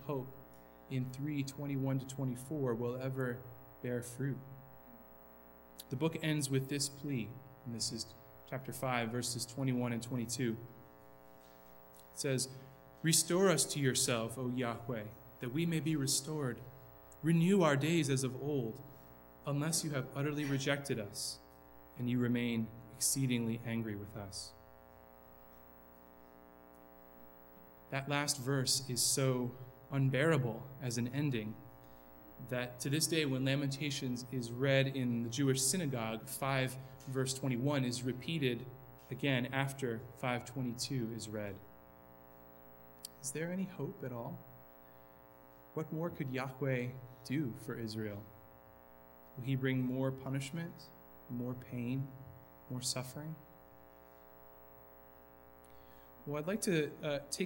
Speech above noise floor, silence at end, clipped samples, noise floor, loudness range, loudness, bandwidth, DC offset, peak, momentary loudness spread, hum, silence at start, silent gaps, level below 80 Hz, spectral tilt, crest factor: 23 dB; 0 s; under 0.1%; -59 dBFS; 10 LU; -37 LUFS; 18 kHz; under 0.1%; -16 dBFS; 25 LU; 60 Hz at -65 dBFS; 0 s; none; -70 dBFS; -4.5 dB/octave; 22 dB